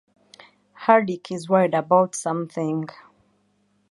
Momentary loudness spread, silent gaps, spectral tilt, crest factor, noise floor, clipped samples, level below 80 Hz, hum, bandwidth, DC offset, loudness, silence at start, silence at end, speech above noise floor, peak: 11 LU; none; -6 dB/octave; 22 dB; -66 dBFS; under 0.1%; -72 dBFS; none; 11.5 kHz; under 0.1%; -22 LUFS; 0.8 s; 1.05 s; 45 dB; -2 dBFS